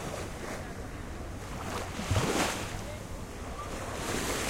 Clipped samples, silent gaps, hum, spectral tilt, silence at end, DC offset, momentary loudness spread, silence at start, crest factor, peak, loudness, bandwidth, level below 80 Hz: under 0.1%; none; none; -4 dB/octave; 0 s; under 0.1%; 12 LU; 0 s; 20 dB; -14 dBFS; -35 LUFS; 16 kHz; -44 dBFS